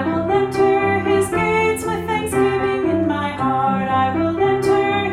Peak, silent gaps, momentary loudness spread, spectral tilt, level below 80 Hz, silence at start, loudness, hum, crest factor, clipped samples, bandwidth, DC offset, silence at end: -6 dBFS; none; 4 LU; -6 dB/octave; -46 dBFS; 0 s; -18 LUFS; none; 12 dB; under 0.1%; 14 kHz; under 0.1%; 0 s